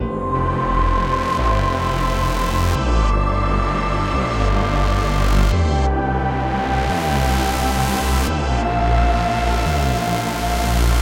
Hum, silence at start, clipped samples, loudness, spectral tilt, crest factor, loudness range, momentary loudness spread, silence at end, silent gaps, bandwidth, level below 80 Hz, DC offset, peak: none; 0 s; under 0.1%; -19 LUFS; -5.5 dB/octave; 14 dB; 1 LU; 3 LU; 0 s; none; 17 kHz; -20 dBFS; under 0.1%; -4 dBFS